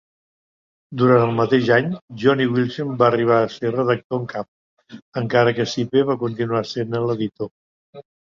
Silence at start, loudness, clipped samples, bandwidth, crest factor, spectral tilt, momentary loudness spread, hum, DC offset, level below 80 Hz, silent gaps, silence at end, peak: 0.9 s; -20 LUFS; under 0.1%; 7.4 kHz; 18 dB; -7 dB/octave; 13 LU; none; under 0.1%; -60 dBFS; 2.01-2.08 s, 4.04-4.10 s, 4.48-4.77 s, 5.02-5.12 s, 7.51-7.93 s; 0.3 s; -2 dBFS